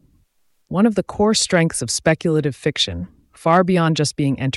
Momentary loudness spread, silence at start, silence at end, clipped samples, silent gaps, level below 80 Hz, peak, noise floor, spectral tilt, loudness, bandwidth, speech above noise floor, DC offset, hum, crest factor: 8 LU; 0.7 s; 0 s; under 0.1%; none; -48 dBFS; -4 dBFS; -62 dBFS; -4.5 dB/octave; -18 LUFS; 12 kHz; 44 dB; under 0.1%; none; 16 dB